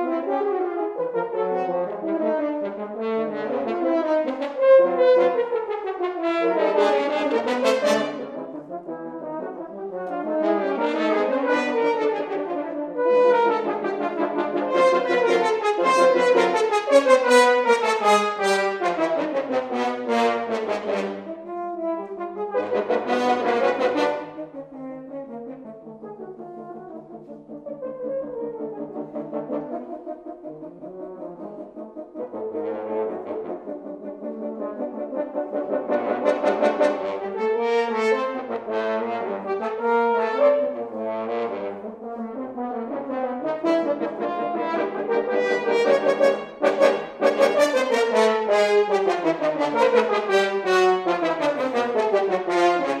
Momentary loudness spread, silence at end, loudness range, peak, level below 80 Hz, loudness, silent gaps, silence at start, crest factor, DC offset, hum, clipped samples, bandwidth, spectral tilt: 16 LU; 0 s; 13 LU; -2 dBFS; -70 dBFS; -22 LUFS; none; 0 s; 20 dB; under 0.1%; none; under 0.1%; 13.5 kHz; -4 dB/octave